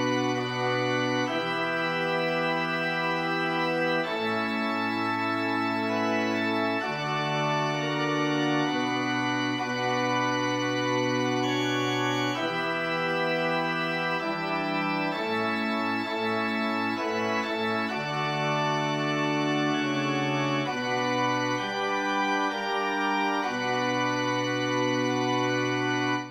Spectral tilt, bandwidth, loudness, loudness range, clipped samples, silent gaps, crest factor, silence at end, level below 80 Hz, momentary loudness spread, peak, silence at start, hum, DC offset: -5 dB/octave; 16.5 kHz; -27 LUFS; 1 LU; under 0.1%; none; 14 dB; 0 s; -72 dBFS; 2 LU; -14 dBFS; 0 s; none; under 0.1%